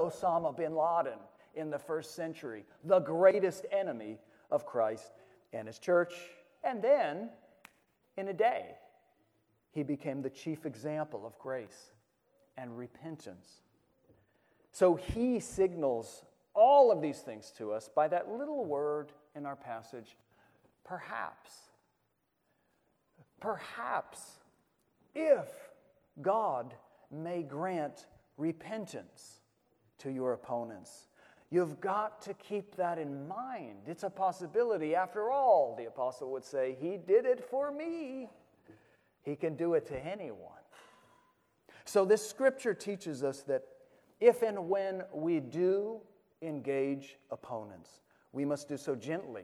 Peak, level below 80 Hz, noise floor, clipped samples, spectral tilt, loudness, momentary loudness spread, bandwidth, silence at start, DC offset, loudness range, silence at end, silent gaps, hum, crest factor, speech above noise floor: -12 dBFS; -68 dBFS; -79 dBFS; under 0.1%; -6 dB/octave; -34 LUFS; 18 LU; 14 kHz; 0 s; under 0.1%; 13 LU; 0 s; none; none; 22 dB; 46 dB